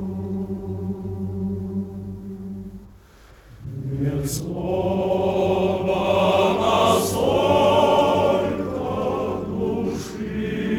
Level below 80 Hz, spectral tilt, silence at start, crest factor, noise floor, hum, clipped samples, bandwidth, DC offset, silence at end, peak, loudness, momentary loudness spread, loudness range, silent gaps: -44 dBFS; -6 dB/octave; 0 s; 18 dB; -48 dBFS; none; under 0.1%; 18.5 kHz; under 0.1%; 0 s; -4 dBFS; -22 LUFS; 16 LU; 12 LU; none